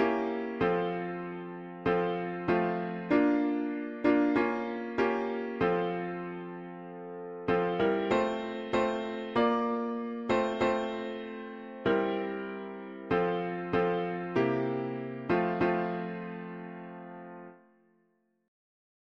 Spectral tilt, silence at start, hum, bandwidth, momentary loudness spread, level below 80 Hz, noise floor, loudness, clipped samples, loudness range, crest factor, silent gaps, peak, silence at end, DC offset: -7.5 dB/octave; 0 s; none; 7.4 kHz; 14 LU; -62 dBFS; -73 dBFS; -31 LUFS; under 0.1%; 4 LU; 18 dB; none; -14 dBFS; 1.5 s; under 0.1%